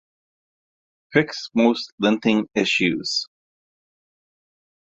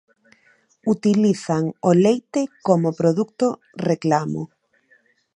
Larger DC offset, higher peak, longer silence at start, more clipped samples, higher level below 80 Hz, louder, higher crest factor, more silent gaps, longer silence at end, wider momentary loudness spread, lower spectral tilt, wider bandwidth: neither; about the same, -2 dBFS vs -2 dBFS; first, 1.1 s vs 0.85 s; neither; about the same, -64 dBFS vs -66 dBFS; about the same, -21 LUFS vs -20 LUFS; about the same, 22 dB vs 20 dB; first, 1.92-1.98 s vs none; first, 1.65 s vs 0.9 s; second, 6 LU vs 10 LU; second, -4.5 dB/octave vs -7 dB/octave; second, 8 kHz vs 10 kHz